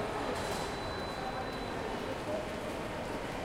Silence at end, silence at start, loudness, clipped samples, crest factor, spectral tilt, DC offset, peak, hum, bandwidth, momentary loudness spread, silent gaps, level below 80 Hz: 0 s; 0 s; -37 LUFS; under 0.1%; 14 dB; -4.5 dB/octave; under 0.1%; -24 dBFS; none; 16 kHz; 3 LU; none; -52 dBFS